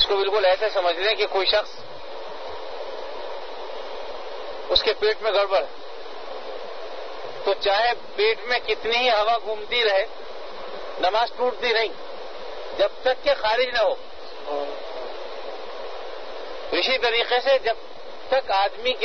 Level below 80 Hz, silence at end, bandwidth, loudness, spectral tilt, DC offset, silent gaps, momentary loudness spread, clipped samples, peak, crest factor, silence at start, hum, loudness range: -52 dBFS; 0 s; 6.6 kHz; -23 LUFS; -2.5 dB/octave; 2%; none; 16 LU; under 0.1%; -4 dBFS; 20 dB; 0 s; none; 5 LU